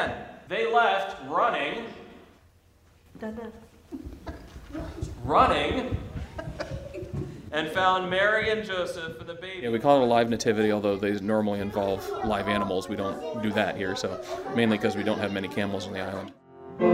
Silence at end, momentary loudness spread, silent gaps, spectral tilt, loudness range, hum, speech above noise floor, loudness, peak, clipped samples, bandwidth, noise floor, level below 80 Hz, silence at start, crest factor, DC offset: 0 s; 17 LU; none; -5.5 dB/octave; 8 LU; none; 32 dB; -27 LUFS; -6 dBFS; under 0.1%; 16 kHz; -59 dBFS; -48 dBFS; 0 s; 22 dB; under 0.1%